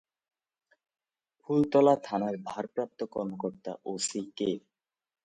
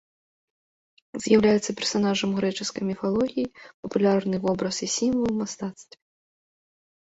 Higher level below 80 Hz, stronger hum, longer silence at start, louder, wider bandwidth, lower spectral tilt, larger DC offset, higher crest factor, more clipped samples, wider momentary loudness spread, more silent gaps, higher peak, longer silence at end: second, -70 dBFS vs -58 dBFS; neither; first, 1.5 s vs 1.15 s; second, -30 LUFS vs -25 LUFS; first, 9.6 kHz vs 8 kHz; about the same, -5 dB/octave vs -4.5 dB/octave; neither; about the same, 22 dB vs 20 dB; neither; about the same, 13 LU vs 13 LU; second, none vs 3.74-3.83 s; second, -10 dBFS vs -6 dBFS; second, 0.65 s vs 1.2 s